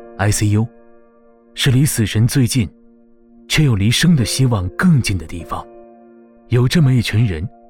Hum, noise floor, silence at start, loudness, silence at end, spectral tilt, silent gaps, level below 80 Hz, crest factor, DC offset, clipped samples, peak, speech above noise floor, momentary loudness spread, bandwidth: none; -48 dBFS; 0 s; -16 LUFS; 0.2 s; -5 dB/octave; none; -36 dBFS; 12 dB; under 0.1%; under 0.1%; -6 dBFS; 34 dB; 12 LU; 17.5 kHz